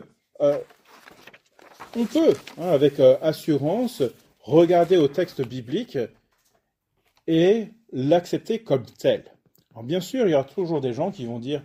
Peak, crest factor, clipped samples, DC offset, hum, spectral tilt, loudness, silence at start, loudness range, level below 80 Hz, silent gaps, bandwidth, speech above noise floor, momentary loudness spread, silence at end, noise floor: -4 dBFS; 20 dB; under 0.1%; under 0.1%; none; -7 dB/octave; -22 LUFS; 0 s; 5 LU; -66 dBFS; none; 16 kHz; 51 dB; 13 LU; 0.05 s; -73 dBFS